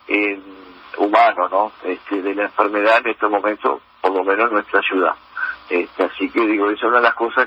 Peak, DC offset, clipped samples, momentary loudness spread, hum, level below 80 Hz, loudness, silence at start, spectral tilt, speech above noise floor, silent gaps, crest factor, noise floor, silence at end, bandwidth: 0 dBFS; under 0.1%; under 0.1%; 9 LU; none; -64 dBFS; -18 LUFS; 0.1 s; -5 dB/octave; 20 dB; none; 18 dB; -37 dBFS; 0 s; 8.6 kHz